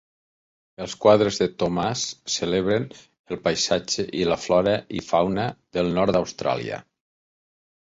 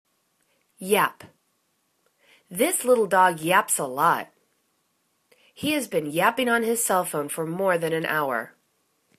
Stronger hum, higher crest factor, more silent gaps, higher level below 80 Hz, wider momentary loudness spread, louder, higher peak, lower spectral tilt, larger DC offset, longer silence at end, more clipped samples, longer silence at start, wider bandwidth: neither; about the same, 22 dB vs 20 dB; first, 3.19-3.24 s vs none; first, -52 dBFS vs -72 dBFS; about the same, 10 LU vs 10 LU; about the same, -23 LUFS vs -23 LUFS; about the same, -4 dBFS vs -4 dBFS; first, -4.5 dB/octave vs -3 dB/octave; neither; first, 1.15 s vs 0.7 s; neither; about the same, 0.8 s vs 0.8 s; second, 8 kHz vs 14 kHz